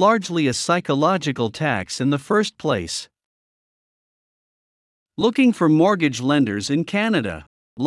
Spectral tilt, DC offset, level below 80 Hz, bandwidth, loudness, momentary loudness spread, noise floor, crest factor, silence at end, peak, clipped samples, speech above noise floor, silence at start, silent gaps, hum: -5 dB/octave; under 0.1%; -60 dBFS; 12 kHz; -20 LUFS; 8 LU; under -90 dBFS; 16 dB; 0 s; -4 dBFS; under 0.1%; over 71 dB; 0 s; 3.25-5.06 s, 7.47-7.77 s; none